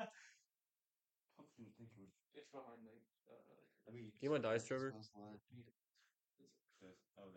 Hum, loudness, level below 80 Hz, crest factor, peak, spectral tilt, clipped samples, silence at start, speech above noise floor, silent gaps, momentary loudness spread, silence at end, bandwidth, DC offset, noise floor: none; -46 LUFS; under -90 dBFS; 22 dB; -30 dBFS; -5.5 dB/octave; under 0.1%; 0 s; over 41 dB; none; 26 LU; 0 s; 16.5 kHz; under 0.1%; under -90 dBFS